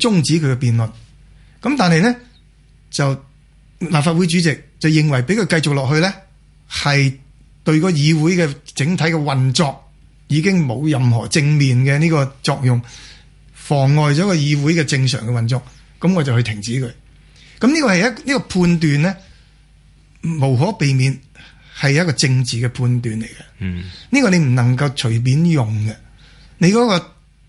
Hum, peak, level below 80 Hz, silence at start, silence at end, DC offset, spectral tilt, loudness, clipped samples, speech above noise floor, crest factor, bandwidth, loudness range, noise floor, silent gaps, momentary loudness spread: none; -2 dBFS; -46 dBFS; 0 s; 0.4 s; under 0.1%; -6 dB/octave; -16 LUFS; under 0.1%; 33 dB; 16 dB; 11.5 kHz; 2 LU; -48 dBFS; none; 12 LU